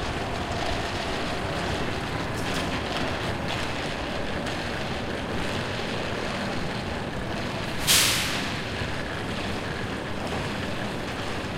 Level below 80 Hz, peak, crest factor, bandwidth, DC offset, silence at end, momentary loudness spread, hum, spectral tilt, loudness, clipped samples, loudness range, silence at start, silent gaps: -42 dBFS; -6 dBFS; 22 dB; 16 kHz; under 0.1%; 0 s; 5 LU; none; -3.5 dB/octave; -28 LUFS; under 0.1%; 4 LU; 0 s; none